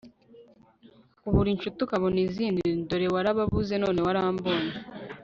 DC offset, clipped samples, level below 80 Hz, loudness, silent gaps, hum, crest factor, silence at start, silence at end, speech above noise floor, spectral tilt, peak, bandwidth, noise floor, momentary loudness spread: under 0.1%; under 0.1%; -44 dBFS; -27 LUFS; none; none; 18 dB; 0.05 s; 0 s; 31 dB; -5.5 dB/octave; -10 dBFS; 7.4 kHz; -57 dBFS; 5 LU